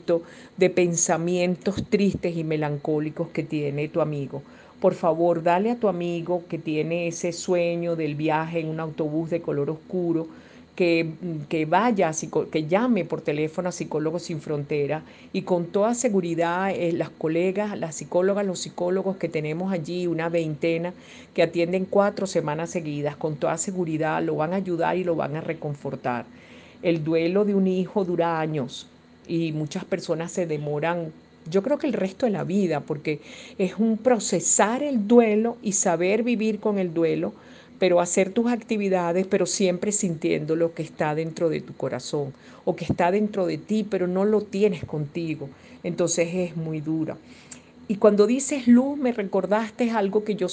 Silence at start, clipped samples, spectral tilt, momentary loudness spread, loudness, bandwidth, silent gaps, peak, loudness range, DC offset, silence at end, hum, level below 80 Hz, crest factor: 0.05 s; under 0.1%; -5.5 dB/octave; 9 LU; -25 LUFS; 10 kHz; none; -4 dBFS; 4 LU; under 0.1%; 0 s; none; -64 dBFS; 20 dB